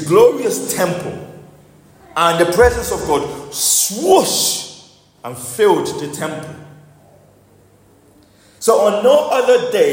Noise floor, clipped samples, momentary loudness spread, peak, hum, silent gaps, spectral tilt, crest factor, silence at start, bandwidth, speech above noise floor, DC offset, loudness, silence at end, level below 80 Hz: -49 dBFS; under 0.1%; 16 LU; 0 dBFS; none; none; -3 dB/octave; 16 dB; 0 s; 16.5 kHz; 35 dB; under 0.1%; -15 LUFS; 0 s; -40 dBFS